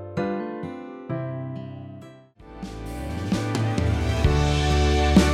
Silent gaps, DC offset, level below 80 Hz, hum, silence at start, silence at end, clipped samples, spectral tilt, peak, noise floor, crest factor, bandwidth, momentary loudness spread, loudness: none; under 0.1%; -30 dBFS; none; 0 s; 0 s; under 0.1%; -6 dB/octave; -6 dBFS; -46 dBFS; 18 dB; 13 kHz; 17 LU; -24 LUFS